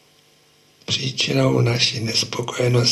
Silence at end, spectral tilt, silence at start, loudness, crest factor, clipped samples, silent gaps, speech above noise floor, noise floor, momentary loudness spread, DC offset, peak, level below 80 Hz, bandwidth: 0 s; -4.5 dB/octave; 0.9 s; -19 LUFS; 16 dB; under 0.1%; none; 36 dB; -56 dBFS; 7 LU; under 0.1%; -4 dBFS; -54 dBFS; 13 kHz